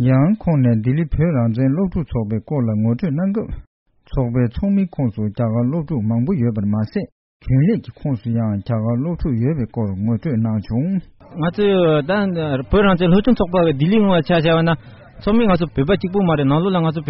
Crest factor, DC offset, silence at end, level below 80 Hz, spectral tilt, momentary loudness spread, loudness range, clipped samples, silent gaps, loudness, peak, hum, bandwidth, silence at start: 14 dB; under 0.1%; 0 s; -36 dBFS; -7 dB/octave; 8 LU; 5 LU; under 0.1%; 3.67-3.86 s, 7.12-7.40 s; -18 LUFS; -4 dBFS; none; 5.8 kHz; 0 s